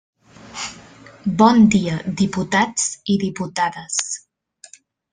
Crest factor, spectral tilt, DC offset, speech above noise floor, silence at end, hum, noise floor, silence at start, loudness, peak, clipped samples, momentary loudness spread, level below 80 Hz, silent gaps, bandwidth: 18 dB; -4.5 dB/octave; under 0.1%; 32 dB; 0.95 s; none; -50 dBFS; 0.45 s; -19 LUFS; -2 dBFS; under 0.1%; 16 LU; -52 dBFS; none; 10 kHz